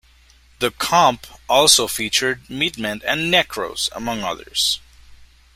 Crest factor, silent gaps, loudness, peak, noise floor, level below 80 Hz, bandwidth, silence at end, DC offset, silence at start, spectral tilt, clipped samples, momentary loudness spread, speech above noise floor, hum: 20 dB; none; -18 LUFS; 0 dBFS; -52 dBFS; -50 dBFS; 16 kHz; 0.3 s; under 0.1%; 0.6 s; -1.5 dB/octave; under 0.1%; 11 LU; 32 dB; none